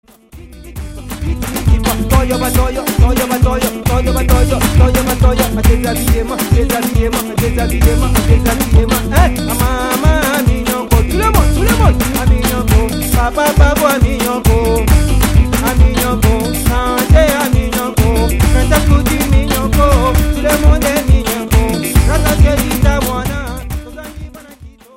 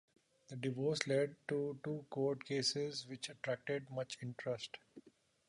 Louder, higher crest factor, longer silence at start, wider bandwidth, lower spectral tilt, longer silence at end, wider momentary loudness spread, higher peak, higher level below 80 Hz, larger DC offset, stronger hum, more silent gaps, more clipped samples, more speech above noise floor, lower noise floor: first, -12 LUFS vs -40 LUFS; second, 12 dB vs 24 dB; second, 0.35 s vs 0.5 s; first, 16.5 kHz vs 11 kHz; about the same, -5.5 dB/octave vs -4.5 dB/octave; about the same, 0.3 s vs 0.4 s; second, 5 LU vs 9 LU; first, 0 dBFS vs -16 dBFS; first, -14 dBFS vs -82 dBFS; neither; neither; neither; neither; about the same, 25 dB vs 26 dB; second, -36 dBFS vs -66 dBFS